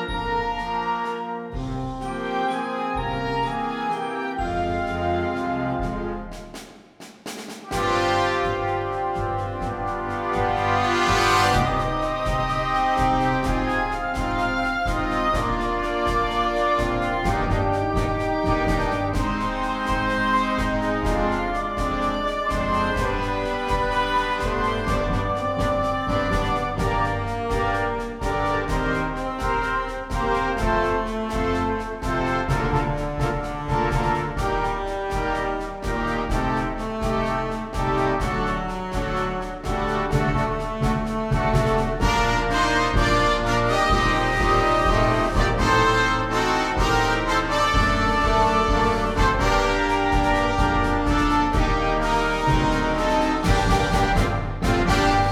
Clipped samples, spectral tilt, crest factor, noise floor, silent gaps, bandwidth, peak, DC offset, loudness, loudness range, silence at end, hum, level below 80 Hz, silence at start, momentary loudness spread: under 0.1%; -5.5 dB/octave; 16 dB; -45 dBFS; none; 15 kHz; -6 dBFS; under 0.1%; -23 LUFS; 6 LU; 0 s; none; -30 dBFS; 0 s; 7 LU